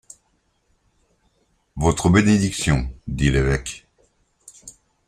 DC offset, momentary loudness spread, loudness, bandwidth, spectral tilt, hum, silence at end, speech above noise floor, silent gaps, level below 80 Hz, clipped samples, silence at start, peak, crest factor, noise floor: under 0.1%; 24 LU; -20 LUFS; 14.5 kHz; -5.5 dB/octave; none; 0.35 s; 48 dB; none; -34 dBFS; under 0.1%; 1.75 s; -2 dBFS; 20 dB; -67 dBFS